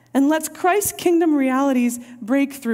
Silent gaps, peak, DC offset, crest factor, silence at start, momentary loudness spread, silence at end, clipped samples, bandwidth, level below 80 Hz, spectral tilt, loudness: none; -6 dBFS; under 0.1%; 12 dB; 0.15 s; 5 LU; 0 s; under 0.1%; 16 kHz; -62 dBFS; -3.5 dB/octave; -19 LUFS